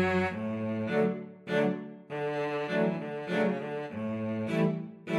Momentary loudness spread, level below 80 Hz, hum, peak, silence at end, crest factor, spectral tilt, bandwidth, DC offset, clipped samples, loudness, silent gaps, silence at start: 7 LU; -72 dBFS; none; -16 dBFS; 0 s; 16 dB; -7.5 dB/octave; 11.5 kHz; under 0.1%; under 0.1%; -32 LUFS; none; 0 s